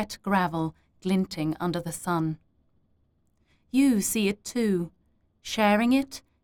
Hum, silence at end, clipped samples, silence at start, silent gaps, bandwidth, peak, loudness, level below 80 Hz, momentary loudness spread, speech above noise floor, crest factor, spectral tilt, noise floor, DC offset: none; 0.25 s; under 0.1%; 0 s; none; 19.5 kHz; -10 dBFS; -26 LUFS; -58 dBFS; 12 LU; 42 dB; 18 dB; -5 dB/octave; -68 dBFS; under 0.1%